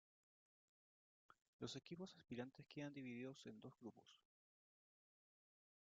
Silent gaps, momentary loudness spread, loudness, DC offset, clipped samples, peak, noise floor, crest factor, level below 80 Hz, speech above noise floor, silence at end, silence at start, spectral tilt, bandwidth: 1.48-1.59 s; 7 LU; -56 LUFS; under 0.1%; under 0.1%; -36 dBFS; under -90 dBFS; 22 dB; under -90 dBFS; over 34 dB; 1.65 s; 1.3 s; -5 dB/octave; 7.4 kHz